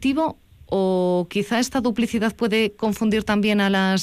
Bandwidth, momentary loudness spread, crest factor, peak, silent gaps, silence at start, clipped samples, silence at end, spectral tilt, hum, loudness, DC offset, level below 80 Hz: 15.5 kHz; 4 LU; 10 dB; -10 dBFS; none; 0 s; under 0.1%; 0 s; -5.5 dB/octave; none; -21 LUFS; under 0.1%; -50 dBFS